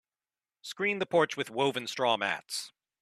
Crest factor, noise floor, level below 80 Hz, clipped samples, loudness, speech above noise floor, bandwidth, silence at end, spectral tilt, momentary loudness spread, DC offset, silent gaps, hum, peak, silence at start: 20 dB; under -90 dBFS; -78 dBFS; under 0.1%; -30 LUFS; over 60 dB; 14 kHz; 0.35 s; -3.5 dB/octave; 14 LU; under 0.1%; none; none; -12 dBFS; 0.65 s